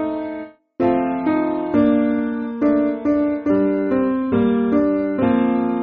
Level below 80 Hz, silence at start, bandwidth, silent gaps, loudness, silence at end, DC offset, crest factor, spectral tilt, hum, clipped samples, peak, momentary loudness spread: -50 dBFS; 0 s; 4.4 kHz; none; -19 LUFS; 0 s; under 0.1%; 14 dB; -7 dB/octave; none; under 0.1%; -4 dBFS; 6 LU